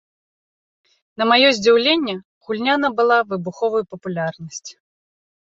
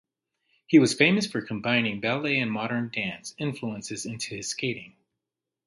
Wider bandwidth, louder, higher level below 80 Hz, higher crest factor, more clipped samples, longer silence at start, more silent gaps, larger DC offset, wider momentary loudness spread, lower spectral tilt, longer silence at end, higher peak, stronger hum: second, 7.8 kHz vs 11.5 kHz; first, -18 LUFS vs -26 LUFS; about the same, -66 dBFS vs -66 dBFS; about the same, 18 dB vs 22 dB; neither; first, 1.2 s vs 0.7 s; first, 2.25-2.41 s vs none; neither; first, 19 LU vs 13 LU; about the same, -4 dB/octave vs -4.5 dB/octave; about the same, 0.9 s vs 0.8 s; first, -2 dBFS vs -6 dBFS; neither